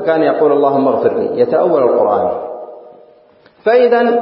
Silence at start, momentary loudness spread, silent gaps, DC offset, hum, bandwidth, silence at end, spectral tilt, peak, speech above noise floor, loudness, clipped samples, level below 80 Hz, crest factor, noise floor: 0 s; 12 LU; none; under 0.1%; none; 5.6 kHz; 0 s; -11.5 dB/octave; 0 dBFS; 35 dB; -13 LUFS; under 0.1%; -62 dBFS; 12 dB; -47 dBFS